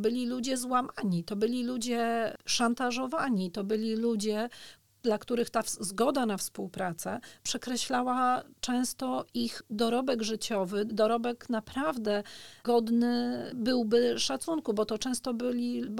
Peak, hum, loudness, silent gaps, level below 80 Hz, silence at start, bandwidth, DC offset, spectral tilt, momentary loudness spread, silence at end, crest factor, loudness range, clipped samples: -14 dBFS; none; -31 LUFS; none; -64 dBFS; 0 s; 17.5 kHz; 0.2%; -4 dB/octave; 7 LU; 0 s; 16 dB; 2 LU; under 0.1%